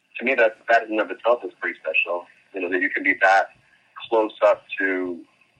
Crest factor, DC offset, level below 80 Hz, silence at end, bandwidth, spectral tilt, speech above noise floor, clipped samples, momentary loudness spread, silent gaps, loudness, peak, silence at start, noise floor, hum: 18 dB; under 0.1%; -74 dBFS; 0.35 s; 8.6 kHz; -3.5 dB/octave; 21 dB; under 0.1%; 13 LU; none; -22 LUFS; -4 dBFS; 0.15 s; -43 dBFS; none